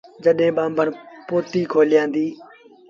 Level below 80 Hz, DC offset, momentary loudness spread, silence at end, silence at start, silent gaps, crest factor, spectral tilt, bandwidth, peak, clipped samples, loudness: -66 dBFS; under 0.1%; 8 LU; 0.45 s; 0.2 s; none; 16 dB; -7 dB/octave; 7.2 kHz; -4 dBFS; under 0.1%; -20 LUFS